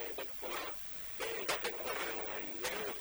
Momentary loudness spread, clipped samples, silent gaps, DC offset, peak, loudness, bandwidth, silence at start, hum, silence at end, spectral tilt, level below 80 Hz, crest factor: 4 LU; under 0.1%; none; under 0.1%; -22 dBFS; -38 LUFS; over 20 kHz; 0 s; none; 0 s; -1.5 dB/octave; -66 dBFS; 18 dB